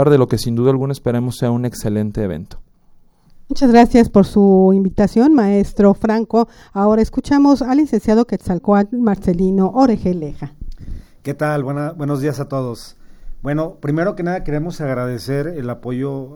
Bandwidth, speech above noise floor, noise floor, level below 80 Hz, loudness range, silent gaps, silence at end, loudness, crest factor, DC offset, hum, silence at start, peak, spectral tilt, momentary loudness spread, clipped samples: 16.5 kHz; 33 dB; -48 dBFS; -34 dBFS; 9 LU; none; 0 s; -16 LUFS; 16 dB; under 0.1%; none; 0 s; 0 dBFS; -8 dB/octave; 12 LU; under 0.1%